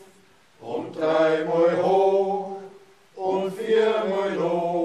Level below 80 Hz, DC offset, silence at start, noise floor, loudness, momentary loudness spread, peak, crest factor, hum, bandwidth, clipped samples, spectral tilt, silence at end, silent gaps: -74 dBFS; under 0.1%; 0.6 s; -57 dBFS; -23 LUFS; 13 LU; -8 dBFS; 14 dB; none; 12 kHz; under 0.1%; -6.5 dB/octave; 0 s; none